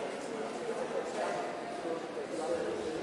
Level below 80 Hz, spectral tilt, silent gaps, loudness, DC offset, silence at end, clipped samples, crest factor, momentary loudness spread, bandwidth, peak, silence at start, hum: -72 dBFS; -4 dB/octave; none; -37 LUFS; under 0.1%; 0 s; under 0.1%; 16 dB; 4 LU; 11.5 kHz; -22 dBFS; 0 s; none